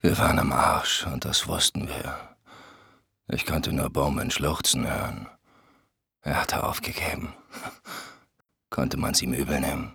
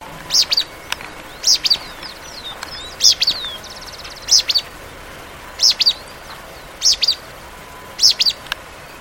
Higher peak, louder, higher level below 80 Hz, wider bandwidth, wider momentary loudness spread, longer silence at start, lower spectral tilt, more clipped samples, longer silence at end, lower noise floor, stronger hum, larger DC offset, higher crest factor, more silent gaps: second, -6 dBFS vs 0 dBFS; second, -26 LUFS vs -14 LUFS; about the same, -44 dBFS vs -46 dBFS; first, over 20 kHz vs 17 kHz; second, 17 LU vs 23 LU; about the same, 0.05 s vs 0 s; first, -3.5 dB/octave vs 1 dB/octave; neither; about the same, 0 s vs 0 s; first, -70 dBFS vs -36 dBFS; neither; neither; about the same, 22 dB vs 20 dB; neither